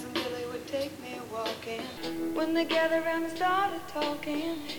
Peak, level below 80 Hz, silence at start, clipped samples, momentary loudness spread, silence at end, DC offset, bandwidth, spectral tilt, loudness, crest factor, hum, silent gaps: -16 dBFS; -64 dBFS; 0 s; under 0.1%; 10 LU; 0 s; under 0.1%; over 20 kHz; -4 dB/octave; -31 LUFS; 16 dB; none; none